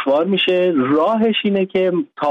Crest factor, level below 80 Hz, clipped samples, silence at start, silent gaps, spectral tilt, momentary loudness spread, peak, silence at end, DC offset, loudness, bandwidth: 10 dB; -62 dBFS; under 0.1%; 0 s; none; -7.5 dB/octave; 3 LU; -6 dBFS; 0 s; under 0.1%; -16 LUFS; 6.2 kHz